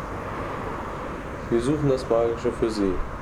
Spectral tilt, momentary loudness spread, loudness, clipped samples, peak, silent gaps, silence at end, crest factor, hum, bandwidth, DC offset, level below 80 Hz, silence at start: -7 dB/octave; 10 LU; -26 LUFS; under 0.1%; -8 dBFS; none; 0 s; 16 dB; none; 13.5 kHz; under 0.1%; -38 dBFS; 0 s